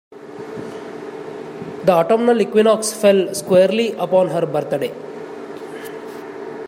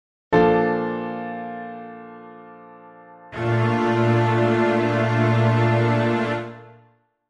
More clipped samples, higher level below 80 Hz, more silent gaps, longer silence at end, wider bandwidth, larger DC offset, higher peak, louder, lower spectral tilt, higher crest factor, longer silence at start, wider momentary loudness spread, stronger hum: neither; second, -66 dBFS vs -54 dBFS; neither; second, 0 s vs 0.6 s; first, 16 kHz vs 8 kHz; neither; about the same, -2 dBFS vs -4 dBFS; first, -16 LUFS vs -20 LUFS; second, -5 dB/octave vs -8 dB/octave; about the same, 16 dB vs 16 dB; second, 0.1 s vs 0.3 s; about the same, 17 LU vs 19 LU; neither